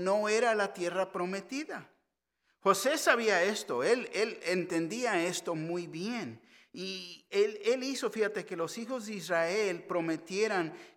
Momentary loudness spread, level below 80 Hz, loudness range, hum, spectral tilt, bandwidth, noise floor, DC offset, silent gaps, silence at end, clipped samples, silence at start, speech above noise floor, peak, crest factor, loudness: 11 LU; -86 dBFS; 5 LU; none; -3.5 dB/octave; 17 kHz; -81 dBFS; under 0.1%; none; 0.1 s; under 0.1%; 0 s; 49 dB; -10 dBFS; 24 dB; -32 LUFS